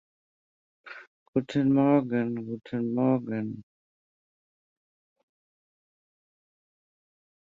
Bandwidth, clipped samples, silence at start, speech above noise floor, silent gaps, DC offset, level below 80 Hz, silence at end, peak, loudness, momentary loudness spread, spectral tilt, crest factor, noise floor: 7.4 kHz; under 0.1%; 0.85 s; over 64 dB; 1.07-1.33 s; under 0.1%; -70 dBFS; 3.8 s; -10 dBFS; -27 LUFS; 23 LU; -9 dB/octave; 22 dB; under -90 dBFS